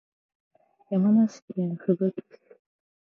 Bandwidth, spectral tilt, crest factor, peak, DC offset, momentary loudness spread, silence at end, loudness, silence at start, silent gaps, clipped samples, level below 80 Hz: 7 kHz; -9.5 dB/octave; 18 dB; -10 dBFS; under 0.1%; 10 LU; 1 s; -25 LUFS; 0.9 s; 1.42-1.48 s; under 0.1%; -80 dBFS